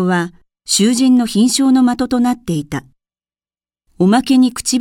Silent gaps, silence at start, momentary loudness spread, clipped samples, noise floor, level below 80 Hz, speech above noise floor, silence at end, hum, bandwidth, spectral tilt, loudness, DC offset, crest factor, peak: none; 0 s; 12 LU; under 0.1%; under -90 dBFS; -48 dBFS; over 77 dB; 0 s; none; 16.5 kHz; -4.5 dB/octave; -14 LUFS; under 0.1%; 14 dB; -2 dBFS